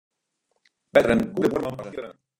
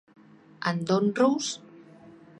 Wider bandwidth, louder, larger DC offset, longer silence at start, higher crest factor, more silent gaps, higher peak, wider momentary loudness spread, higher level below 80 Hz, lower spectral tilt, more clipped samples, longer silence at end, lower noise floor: first, 16.5 kHz vs 11 kHz; first, -23 LUFS vs -26 LUFS; neither; first, 0.95 s vs 0.6 s; about the same, 22 dB vs 18 dB; neither; first, -4 dBFS vs -10 dBFS; first, 16 LU vs 10 LU; first, -52 dBFS vs -74 dBFS; first, -6.5 dB/octave vs -5 dB/octave; neither; about the same, 0.25 s vs 0.3 s; first, -75 dBFS vs -51 dBFS